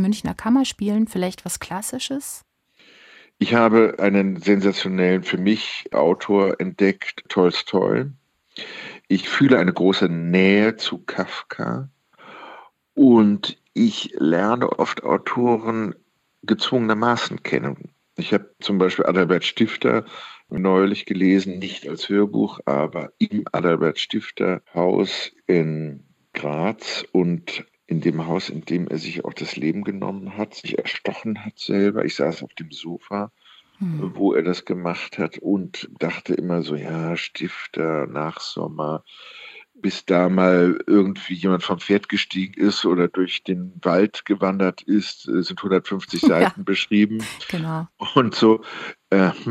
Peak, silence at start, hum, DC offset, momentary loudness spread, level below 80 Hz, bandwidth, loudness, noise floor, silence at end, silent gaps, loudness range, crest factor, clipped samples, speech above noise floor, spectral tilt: -2 dBFS; 0 s; none; under 0.1%; 13 LU; -64 dBFS; 14 kHz; -21 LUFS; -54 dBFS; 0 s; none; 6 LU; 20 dB; under 0.1%; 34 dB; -6 dB/octave